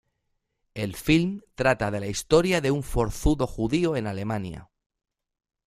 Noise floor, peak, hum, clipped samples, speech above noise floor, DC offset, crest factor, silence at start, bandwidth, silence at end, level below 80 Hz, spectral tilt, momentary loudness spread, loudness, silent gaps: -77 dBFS; -4 dBFS; none; under 0.1%; 52 dB; under 0.1%; 22 dB; 0.75 s; 15.5 kHz; 1 s; -40 dBFS; -5.5 dB/octave; 11 LU; -25 LUFS; none